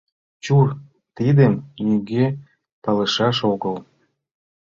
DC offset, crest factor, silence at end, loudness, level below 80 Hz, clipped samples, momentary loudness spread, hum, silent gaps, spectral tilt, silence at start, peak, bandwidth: under 0.1%; 18 dB; 0.9 s; -20 LUFS; -56 dBFS; under 0.1%; 16 LU; none; 2.72-2.82 s; -7 dB/octave; 0.45 s; -4 dBFS; 7.4 kHz